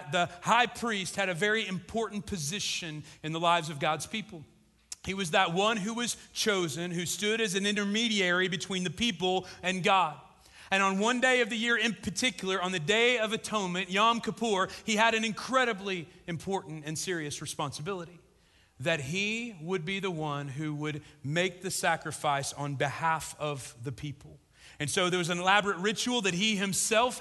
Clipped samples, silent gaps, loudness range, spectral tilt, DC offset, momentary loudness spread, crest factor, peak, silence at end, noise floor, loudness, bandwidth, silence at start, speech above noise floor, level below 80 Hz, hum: under 0.1%; none; 6 LU; -3.5 dB/octave; under 0.1%; 12 LU; 20 dB; -10 dBFS; 0 s; -64 dBFS; -29 LUFS; 12.5 kHz; 0 s; 34 dB; -62 dBFS; none